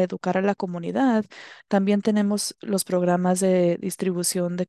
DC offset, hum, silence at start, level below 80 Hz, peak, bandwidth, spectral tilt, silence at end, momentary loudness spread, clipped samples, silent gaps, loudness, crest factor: under 0.1%; none; 0 s; -70 dBFS; -8 dBFS; 13 kHz; -5.5 dB/octave; 0.05 s; 6 LU; under 0.1%; none; -23 LUFS; 14 dB